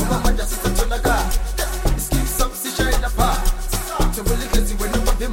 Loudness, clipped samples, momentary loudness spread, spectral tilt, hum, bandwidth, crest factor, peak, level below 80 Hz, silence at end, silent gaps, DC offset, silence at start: -21 LUFS; under 0.1%; 4 LU; -4 dB/octave; none; 17 kHz; 14 dB; -4 dBFS; -20 dBFS; 0 s; none; under 0.1%; 0 s